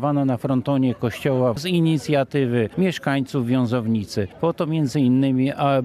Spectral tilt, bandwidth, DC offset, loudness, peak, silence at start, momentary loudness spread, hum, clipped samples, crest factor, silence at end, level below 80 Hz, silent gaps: -7.5 dB/octave; 14 kHz; under 0.1%; -21 LUFS; -8 dBFS; 0 s; 5 LU; none; under 0.1%; 14 dB; 0 s; -58 dBFS; none